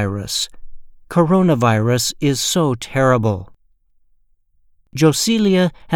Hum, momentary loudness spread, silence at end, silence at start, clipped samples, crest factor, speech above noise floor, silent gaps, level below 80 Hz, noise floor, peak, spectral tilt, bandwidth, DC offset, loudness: none; 8 LU; 0 s; 0 s; under 0.1%; 18 dB; 40 dB; none; -46 dBFS; -57 dBFS; 0 dBFS; -5 dB/octave; 17.5 kHz; under 0.1%; -17 LUFS